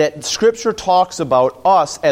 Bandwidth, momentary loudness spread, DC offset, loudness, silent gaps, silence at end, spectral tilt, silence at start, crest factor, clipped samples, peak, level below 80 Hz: 16 kHz; 2 LU; under 0.1%; -15 LUFS; none; 0 s; -3.5 dB/octave; 0 s; 14 dB; under 0.1%; -2 dBFS; -52 dBFS